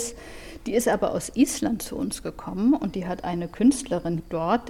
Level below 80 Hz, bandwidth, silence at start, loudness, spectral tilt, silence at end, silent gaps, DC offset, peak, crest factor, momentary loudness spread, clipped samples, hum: -48 dBFS; 16.5 kHz; 0 s; -25 LUFS; -5 dB/octave; 0 s; none; under 0.1%; -8 dBFS; 18 dB; 11 LU; under 0.1%; none